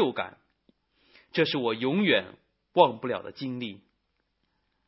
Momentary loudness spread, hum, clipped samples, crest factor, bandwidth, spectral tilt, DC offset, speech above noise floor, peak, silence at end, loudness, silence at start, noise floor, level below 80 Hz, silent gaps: 14 LU; none; under 0.1%; 24 dB; 5.8 kHz; -9.5 dB/octave; under 0.1%; 50 dB; -4 dBFS; 1.1 s; -27 LUFS; 0 s; -76 dBFS; -72 dBFS; none